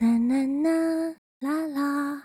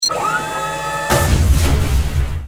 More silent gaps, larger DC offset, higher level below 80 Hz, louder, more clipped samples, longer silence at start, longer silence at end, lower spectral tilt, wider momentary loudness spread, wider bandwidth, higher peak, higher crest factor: first, 1.18-1.41 s vs none; neither; second, -66 dBFS vs -20 dBFS; second, -26 LUFS vs -17 LUFS; neither; about the same, 0 s vs 0 s; about the same, 0.05 s vs 0 s; first, -6 dB/octave vs -4 dB/octave; about the same, 8 LU vs 6 LU; second, 15 kHz vs over 20 kHz; second, -14 dBFS vs -2 dBFS; about the same, 10 dB vs 14 dB